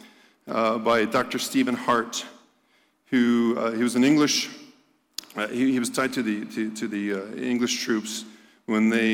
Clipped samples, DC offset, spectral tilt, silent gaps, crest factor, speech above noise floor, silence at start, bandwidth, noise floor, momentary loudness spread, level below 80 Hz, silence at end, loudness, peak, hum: under 0.1%; under 0.1%; -3.5 dB/octave; none; 14 dB; 41 dB; 0.05 s; 17 kHz; -65 dBFS; 13 LU; -68 dBFS; 0 s; -24 LUFS; -12 dBFS; none